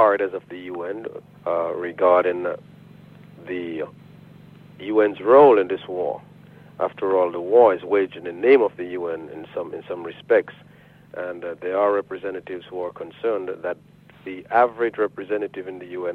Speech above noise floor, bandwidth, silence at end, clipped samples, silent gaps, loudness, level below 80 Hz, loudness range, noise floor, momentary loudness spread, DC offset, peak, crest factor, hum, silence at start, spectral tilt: 25 dB; 4.5 kHz; 0 s; under 0.1%; none; -22 LUFS; -66 dBFS; 8 LU; -46 dBFS; 17 LU; under 0.1%; -4 dBFS; 20 dB; none; 0 s; -8 dB/octave